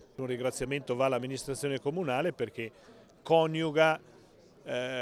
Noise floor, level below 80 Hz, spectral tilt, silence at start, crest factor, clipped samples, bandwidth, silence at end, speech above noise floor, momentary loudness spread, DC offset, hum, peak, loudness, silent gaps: -58 dBFS; -62 dBFS; -5 dB/octave; 0 s; 20 dB; under 0.1%; 14.5 kHz; 0 s; 27 dB; 11 LU; under 0.1%; none; -10 dBFS; -31 LUFS; none